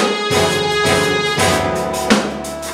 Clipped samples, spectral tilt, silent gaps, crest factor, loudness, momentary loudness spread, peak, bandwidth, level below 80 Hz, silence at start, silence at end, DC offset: under 0.1%; -3.5 dB/octave; none; 16 dB; -15 LUFS; 5 LU; 0 dBFS; 16 kHz; -40 dBFS; 0 s; 0 s; under 0.1%